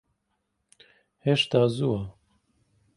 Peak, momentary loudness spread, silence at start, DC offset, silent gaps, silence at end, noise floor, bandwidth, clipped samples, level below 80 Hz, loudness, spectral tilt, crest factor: -8 dBFS; 10 LU; 1.25 s; under 0.1%; none; 0.85 s; -77 dBFS; 11.5 kHz; under 0.1%; -58 dBFS; -25 LUFS; -6 dB/octave; 22 dB